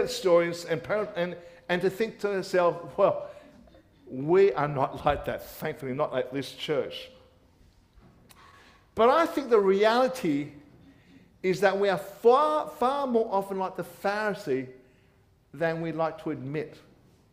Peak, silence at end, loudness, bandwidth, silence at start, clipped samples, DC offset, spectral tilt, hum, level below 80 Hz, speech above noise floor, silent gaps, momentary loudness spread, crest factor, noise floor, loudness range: -10 dBFS; 0.55 s; -27 LUFS; 15.5 kHz; 0 s; under 0.1%; under 0.1%; -5.5 dB/octave; none; -60 dBFS; 36 dB; none; 13 LU; 18 dB; -62 dBFS; 7 LU